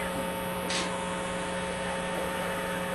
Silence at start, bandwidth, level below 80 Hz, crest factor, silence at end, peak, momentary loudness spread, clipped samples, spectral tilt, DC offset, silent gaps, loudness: 0 s; 12.5 kHz; -52 dBFS; 14 dB; 0 s; -18 dBFS; 3 LU; under 0.1%; -3.5 dB/octave; under 0.1%; none; -32 LUFS